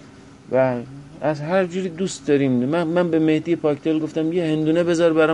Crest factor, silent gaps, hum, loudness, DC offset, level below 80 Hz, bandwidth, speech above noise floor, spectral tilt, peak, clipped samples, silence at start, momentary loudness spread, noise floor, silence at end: 14 dB; none; none; -21 LUFS; under 0.1%; -58 dBFS; 10.5 kHz; 24 dB; -6.5 dB/octave; -6 dBFS; under 0.1%; 0.05 s; 7 LU; -43 dBFS; 0 s